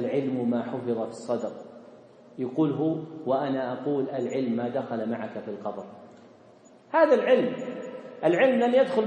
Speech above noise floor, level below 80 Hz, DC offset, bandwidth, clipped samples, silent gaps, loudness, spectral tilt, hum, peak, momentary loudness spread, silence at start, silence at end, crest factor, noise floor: 28 dB; -80 dBFS; under 0.1%; 9.2 kHz; under 0.1%; none; -27 LUFS; -7 dB/octave; none; -8 dBFS; 15 LU; 0 s; 0 s; 20 dB; -54 dBFS